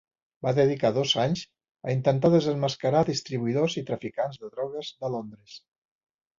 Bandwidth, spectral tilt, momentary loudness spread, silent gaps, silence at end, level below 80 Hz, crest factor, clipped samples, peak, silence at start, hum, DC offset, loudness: 7.6 kHz; -6 dB/octave; 12 LU; 1.71-1.75 s; 0.8 s; -62 dBFS; 18 dB; under 0.1%; -8 dBFS; 0.45 s; none; under 0.1%; -26 LUFS